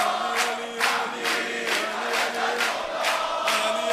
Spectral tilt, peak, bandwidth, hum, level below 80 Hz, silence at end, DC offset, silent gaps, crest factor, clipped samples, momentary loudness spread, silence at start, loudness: -0.5 dB/octave; -6 dBFS; 15.5 kHz; none; -66 dBFS; 0 s; under 0.1%; none; 18 dB; under 0.1%; 2 LU; 0 s; -24 LUFS